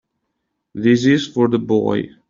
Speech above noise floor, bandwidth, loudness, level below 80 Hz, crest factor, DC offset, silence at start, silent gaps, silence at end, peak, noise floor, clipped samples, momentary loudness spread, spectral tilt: 58 dB; 7.6 kHz; -17 LUFS; -56 dBFS; 14 dB; under 0.1%; 0.75 s; none; 0.25 s; -4 dBFS; -75 dBFS; under 0.1%; 7 LU; -6.5 dB/octave